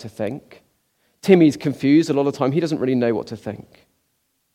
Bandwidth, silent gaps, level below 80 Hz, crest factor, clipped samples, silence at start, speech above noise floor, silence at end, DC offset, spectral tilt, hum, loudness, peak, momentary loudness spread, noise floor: 13.5 kHz; none; -62 dBFS; 20 dB; under 0.1%; 0 s; 51 dB; 0.95 s; under 0.1%; -7 dB/octave; none; -19 LUFS; 0 dBFS; 18 LU; -70 dBFS